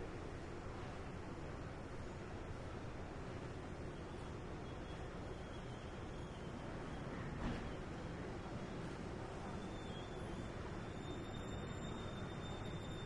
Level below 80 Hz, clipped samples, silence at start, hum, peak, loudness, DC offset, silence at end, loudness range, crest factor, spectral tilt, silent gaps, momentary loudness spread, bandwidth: -54 dBFS; under 0.1%; 0 s; none; -32 dBFS; -49 LUFS; under 0.1%; 0 s; 2 LU; 16 dB; -6 dB/octave; none; 3 LU; 11.5 kHz